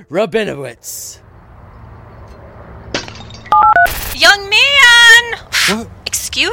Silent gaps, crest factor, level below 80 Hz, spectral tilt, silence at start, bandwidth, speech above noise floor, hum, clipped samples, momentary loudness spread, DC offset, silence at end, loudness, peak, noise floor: none; 14 dB; -38 dBFS; -1 dB/octave; 0.1 s; 17 kHz; 27 dB; none; under 0.1%; 22 LU; under 0.1%; 0 s; -9 LUFS; 0 dBFS; -38 dBFS